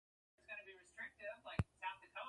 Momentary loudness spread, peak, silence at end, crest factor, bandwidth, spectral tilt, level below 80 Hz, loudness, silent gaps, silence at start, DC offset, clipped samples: 10 LU; -22 dBFS; 0 s; 26 dB; 11 kHz; -6 dB/octave; -60 dBFS; -49 LUFS; none; 0.5 s; under 0.1%; under 0.1%